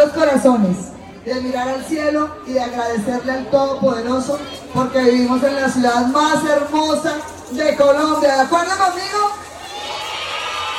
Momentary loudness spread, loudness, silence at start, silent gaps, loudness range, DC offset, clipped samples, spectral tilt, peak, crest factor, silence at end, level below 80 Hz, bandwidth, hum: 11 LU; -17 LUFS; 0 s; none; 4 LU; under 0.1%; under 0.1%; -4.5 dB/octave; -2 dBFS; 16 dB; 0 s; -50 dBFS; 15.5 kHz; none